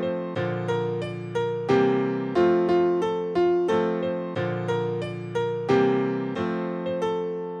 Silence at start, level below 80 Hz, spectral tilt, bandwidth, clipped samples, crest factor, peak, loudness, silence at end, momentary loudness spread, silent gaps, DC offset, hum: 0 s; -62 dBFS; -7.5 dB/octave; 9.2 kHz; under 0.1%; 16 dB; -8 dBFS; -25 LUFS; 0 s; 8 LU; none; under 0.1%; none